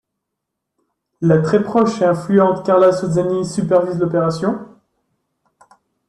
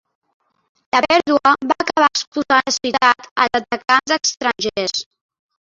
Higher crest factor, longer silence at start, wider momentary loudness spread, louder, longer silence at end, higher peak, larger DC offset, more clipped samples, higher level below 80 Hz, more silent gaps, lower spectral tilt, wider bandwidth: about the same, 16 dB vs 18 dB; first, 1.2 s vs 0.95 s; about the same, 7 LU vs 6 LU; about the same, -16 LUFS vs -17 LUFS; first, 1.4 s vs 0.6 s; about the same, -2 dBFS vs -2 dBFS; neither; neither; about the same, -56 dBFS vs -58 dBFS; second, none vs 2.27-2.32 s, 3.31-3.36 s; first, -7.5 dB/octave vs -1.5 dB/octave; first, 11 kHz vs 7.8 kHz